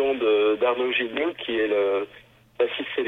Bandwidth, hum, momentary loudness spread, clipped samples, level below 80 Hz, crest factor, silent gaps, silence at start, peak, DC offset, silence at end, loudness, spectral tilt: 4 kHz; none; 7 LU; under 0.1%; -62 dBFS; 14 dB; none; 0 s; -10 dBFS; under 0.1%; 0 s; -24 LUFS; -5.5 dB/octave